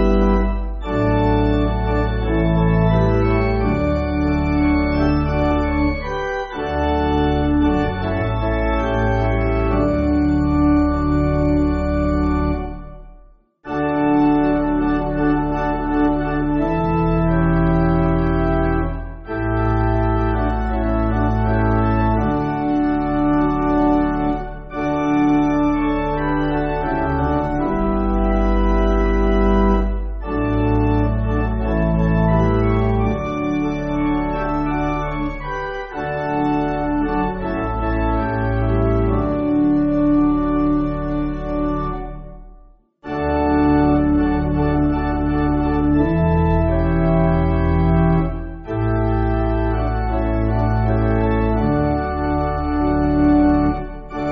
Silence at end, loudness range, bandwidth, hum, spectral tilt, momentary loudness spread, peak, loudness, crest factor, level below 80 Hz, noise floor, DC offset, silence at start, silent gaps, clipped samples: 0 s; 3 LU; 6.2 kHz; none; -7.5 dB/octave; 7 LU; -4 dBFS; -19 LUFS; 14 dB; -24 dBFS; -47 dBFS; under 0.1%; 0 s; none; under 0.1%